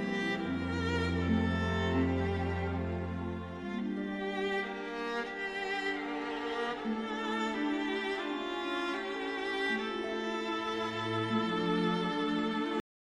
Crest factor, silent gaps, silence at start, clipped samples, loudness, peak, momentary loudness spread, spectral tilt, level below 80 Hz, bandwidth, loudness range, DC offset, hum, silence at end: 16 dB; none; 0 s; under 0.1%; -34 LUFS; -18 dBFS; 6 LU; -6 dB/octave; -60 dBFS; 11.5 kHz; 3 LU; under 0.1%; none; 0.35 s